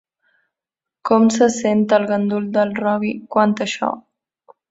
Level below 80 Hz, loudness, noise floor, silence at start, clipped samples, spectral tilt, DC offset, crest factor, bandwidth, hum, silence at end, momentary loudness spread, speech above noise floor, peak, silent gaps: -62 dBFS; -18 LUFS; -87 dBFS; 1.05 s; under 0.1%; -5.5 dB/octave; under 0.1%; 18 dB; 8 kHz; none; 0.7 s; 8 LU; 70 dB; 0 dBFS; none